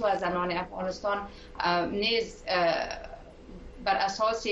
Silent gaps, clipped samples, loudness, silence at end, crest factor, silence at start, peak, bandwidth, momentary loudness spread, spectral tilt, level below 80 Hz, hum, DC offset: none; under 0.1%; -29 LUFS; 0 s; 18 dB; 0 s; -12 dBFS; 8.2 kHz; 19 LU; -4 dB/octave; -50 dBFS; none; under 0.1%